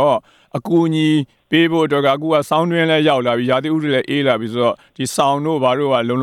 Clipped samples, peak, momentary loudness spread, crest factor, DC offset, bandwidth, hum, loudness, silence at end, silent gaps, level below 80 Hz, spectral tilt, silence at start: under 0.1%; 0 dBFS; 5 LU; 16 dB; under 0.1%; 14.5 kHz; none; -16 LUFS; 0 s; none; -62 dBFS; -5.5 dB/octave; 0 s